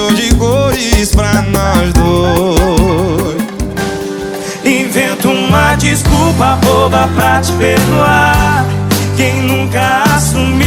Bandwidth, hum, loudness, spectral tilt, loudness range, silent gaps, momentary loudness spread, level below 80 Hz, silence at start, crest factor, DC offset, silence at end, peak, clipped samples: over 20 kHz; none; -11 LUFS; -5 dB/octave; 3 LU; none; 7 LU; -20 dBFS; 0 s; 10 dB; under 0.1%; 0 s; 0 dBFS; under 0.1%